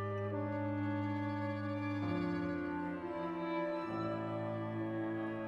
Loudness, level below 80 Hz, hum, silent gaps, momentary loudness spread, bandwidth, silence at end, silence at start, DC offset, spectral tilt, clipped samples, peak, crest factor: -39 LUFS; -68 dBFS; none; none; 3 LU; 7 kHz; 0 s; 0 s; under 0.1%; -9 dB/octave; under 0.1%; -26 dBFS; 12 dB